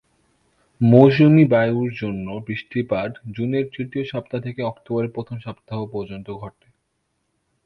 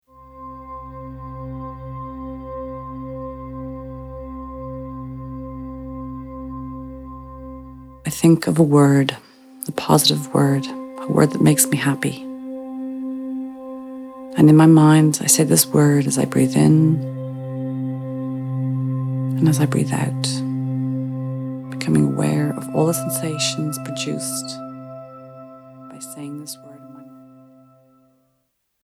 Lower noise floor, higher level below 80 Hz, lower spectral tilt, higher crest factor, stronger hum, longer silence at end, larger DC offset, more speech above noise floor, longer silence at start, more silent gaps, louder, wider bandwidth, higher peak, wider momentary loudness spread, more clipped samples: about the same, -72 dBFS vs -70 dBFS; second, -54 dBFS vs -46 dBFS; first, -10 dB/octave vs -5.5 dB/octave; about the same, 20 dB vs 20 dB; neither; second, 1.15 s vs 1.65 s; neither; about the same, 52 dB vs 54 dB; first, 0.8 s vs 0.2 s; neither; about the same, -20 LUFS vs -18 LUFS; second, 5.8 kHz vs 15.5 kHz; about the same, 0 dBFS vs 0 dBFS; about the same, 20 LU vs 21 LU; neither